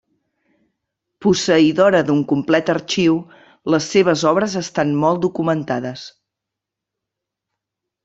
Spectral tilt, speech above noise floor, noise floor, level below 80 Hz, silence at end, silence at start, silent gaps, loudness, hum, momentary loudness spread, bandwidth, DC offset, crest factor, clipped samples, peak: -5 dB/octave; 67 dB; -83 dBFS; -58 dBFS; 1.95 s; 1.2 s; none; -17 LUFS; none; 10 LU; 8 kHz; under 0.1%; 18 dB; under 0.1%; -2 dBFS